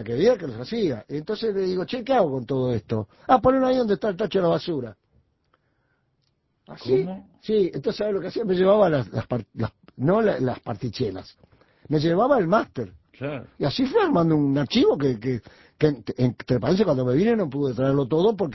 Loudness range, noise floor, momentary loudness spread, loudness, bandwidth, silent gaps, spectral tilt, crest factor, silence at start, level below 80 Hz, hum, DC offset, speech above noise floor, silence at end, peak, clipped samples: 5 LU; -70 dBFS; 12 LU; -23 LUFS; 6 kHz; none; -8 dB/octave; 20 dB; 0 s; -52 dBFS; none; under 0.1%; 48 dB; 0 s; -4 dBFS; under 0.1%